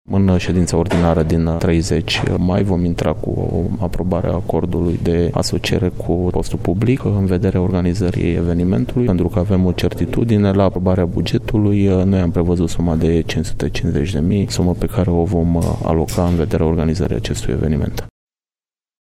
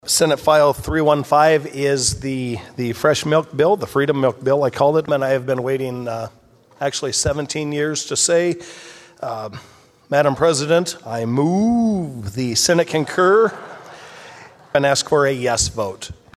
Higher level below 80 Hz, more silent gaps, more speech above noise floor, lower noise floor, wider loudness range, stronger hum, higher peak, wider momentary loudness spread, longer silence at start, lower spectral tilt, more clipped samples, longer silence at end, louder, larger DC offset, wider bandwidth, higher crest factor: first, -30 dBFS vs -44 dBFS; neither; first, over 74 dB vs 24 dB; first, under -90 dBFS vs -42 dBFS; about the same, 2 LU vs 4 LU; neither; about the same, -2 dBFS vs 0 dBFS; second, 5 LU vs 14 LU; about the same, 0.1 s vs 0.05 s; first, -7 dB/octave vs -4 dB/octave; neither; first, 0.9 s vs 0.25 s; about the same, -17 LUFS vs -18 LUFS; neither; about the same, 14.5 kHz vs 14.5 kHz; about the same, 14 dB vs 18 dB